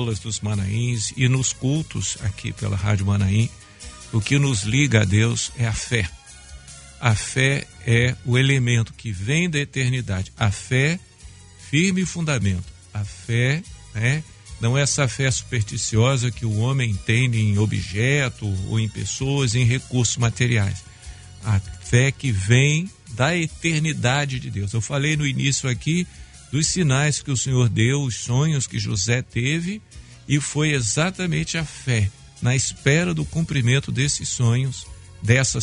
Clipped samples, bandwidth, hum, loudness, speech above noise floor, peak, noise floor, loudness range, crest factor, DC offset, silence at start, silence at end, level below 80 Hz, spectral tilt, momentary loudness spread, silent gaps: under 0.1%; 11 kHz; none; -21 LUFS; 23 dB; 0 dBFS; -44 dBFS; 2 LU; 22 dB; under 0.1%; 0 s; 0 s; -44 dBFS; -4.5 dB/octave; 9 LU; none